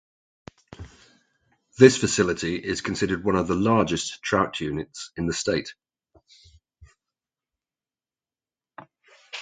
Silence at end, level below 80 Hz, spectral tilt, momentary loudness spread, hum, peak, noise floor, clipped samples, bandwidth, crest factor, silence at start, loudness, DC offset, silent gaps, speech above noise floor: 0 s; -52 dBFS; -4.5 dB/octave; 21 LU; none; 0 dBFS; under -90 dBFS; under 0.1%; 9.6 kHz; 26 dB; 0.8 s; -23 LUFS; under 0.1%; none; over 67 dB